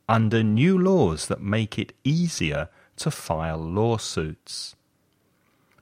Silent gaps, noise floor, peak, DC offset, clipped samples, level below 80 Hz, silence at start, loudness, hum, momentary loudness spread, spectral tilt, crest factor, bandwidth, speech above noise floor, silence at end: none; -67 dBFS; -4 dBFS; under 0.1%; under 0.1%; -46 dBFS; 0.1 s; -24 LUFS; none; 13 LU; -6 dB/octave; 20 dB; 16 kHz; 44 dB; 1.1 s